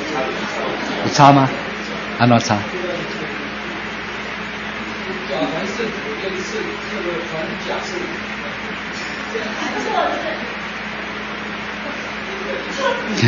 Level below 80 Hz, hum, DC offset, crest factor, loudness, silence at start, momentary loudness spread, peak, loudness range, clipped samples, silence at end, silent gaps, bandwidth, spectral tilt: -48 dBFS; none; under 0.1%; 20 dB; -21 LUFS; 0 s; 10 LU; 0 dBFS; 7 LU; under 0.1%; 0 s; none; 7.6 kHz; -5 dB/octave